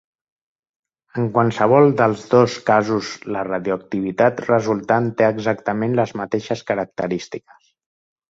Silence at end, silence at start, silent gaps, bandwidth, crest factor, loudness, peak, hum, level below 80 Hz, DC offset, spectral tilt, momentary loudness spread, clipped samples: 0.9 s; 1.15 s; none; 7.8 kHz; 18 dB; -19 LUFS; -2 dBFS; none; -58 dBFS; under 0.1%; -7 dB/octave; 10 LU; under 0.1%